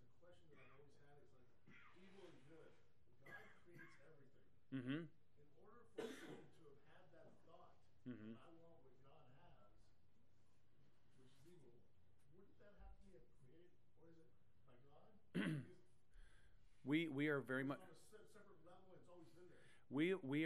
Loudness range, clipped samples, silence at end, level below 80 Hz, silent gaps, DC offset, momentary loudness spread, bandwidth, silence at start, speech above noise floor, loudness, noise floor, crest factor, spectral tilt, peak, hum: 18 LU; under 0.1%; 0 s; -78 dBFS; none; under 0.1%; 25 LU; 13 kHz; 0.25 s; 35 dB; -48 LUFS; -80 dBFS; 26 dB; -7 dB/octave; -28 dBFS; none